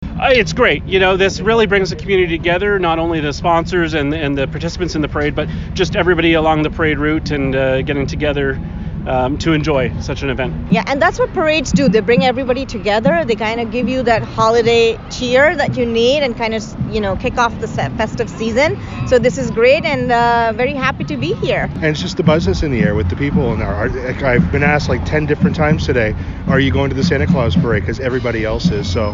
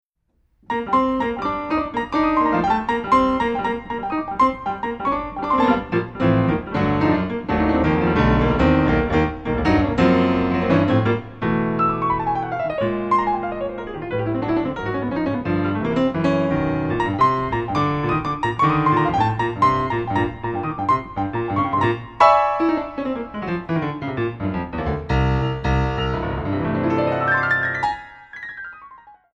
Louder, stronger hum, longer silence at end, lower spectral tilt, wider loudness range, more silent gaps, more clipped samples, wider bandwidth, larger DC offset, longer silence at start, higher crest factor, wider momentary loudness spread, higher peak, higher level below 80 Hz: first, -15 LUFS vs -20 LUFS; neither; second, 0 s vs 0.25 s; second, -6 dB/octave vs -8 dB/octave; about the same, 3 LU vs 4 LU; neither; neither; second, 7.6 kHz vs 8.4 kHz; neither; second, 0 s vs 0.7 s; second, 14 dB vs 20 dB; about the same, 7 LU vs 9 LU; about the same, -2 dBFS vs 0 dBFS; first, -30 dBFS vs -36 dBFS